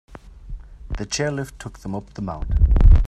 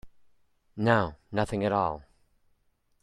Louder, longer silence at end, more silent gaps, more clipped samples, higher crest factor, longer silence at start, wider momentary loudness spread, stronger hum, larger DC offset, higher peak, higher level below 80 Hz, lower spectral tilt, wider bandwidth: first, -23 LUFS vs -28 LUFS; second, 0 s vs 1 s; neither; neither; about the same, 18 dB vs 22 dB; first, 0.45 s vs 0.05 s; first, 23 LU vs 12 LU; neither; neither; first, -2 dBFS vs -8 dBFS; first, -20 dBFS vs -54 dBFS; second, -5.5 dB/octave vs -7 dB/octave; second, 9 kHz vs 11.5 kHz